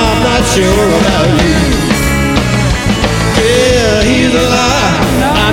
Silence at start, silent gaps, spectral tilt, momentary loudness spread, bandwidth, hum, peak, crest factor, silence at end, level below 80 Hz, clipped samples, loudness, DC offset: 0 s; none; -4.5 dB/octave; 3 LU; 17 kHz; none; 0 dBFS; 10 dB; 0 s; -20 dBFS; under 0.1%; -10 LUFS; 0.2%